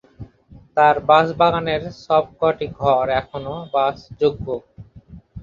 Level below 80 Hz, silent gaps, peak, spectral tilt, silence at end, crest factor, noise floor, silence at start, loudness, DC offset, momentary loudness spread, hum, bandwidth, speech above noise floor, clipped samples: -46 dBFS; none; 0 dBFS; -7 dB/octave; 0 s; 18 dB; -47 dBFS; 0.2 s; -19 LUFS; under 0.1%; 13 LU; none; 7.2 kHz; 29 dB; under 0.1%